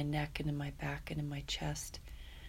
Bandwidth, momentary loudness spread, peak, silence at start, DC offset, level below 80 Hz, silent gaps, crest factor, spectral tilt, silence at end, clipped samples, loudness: 16 kHz; 9 LU; -22 dBFS; 0 s; under 0.1%; -50 dBFS; none; 18 dB; -5 dB/octave; 0 s; under 0.1%; -40 LUFS